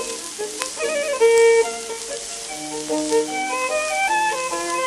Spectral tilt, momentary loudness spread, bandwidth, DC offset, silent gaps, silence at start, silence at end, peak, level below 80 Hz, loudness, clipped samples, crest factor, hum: -1 dB/octave; 13 LU; 14 kHz; under 0.1%; none; 0 s; 0 s; -2 dBFS; -58 dBFS; -21 LUFS; under 0.1%; 20 dB; none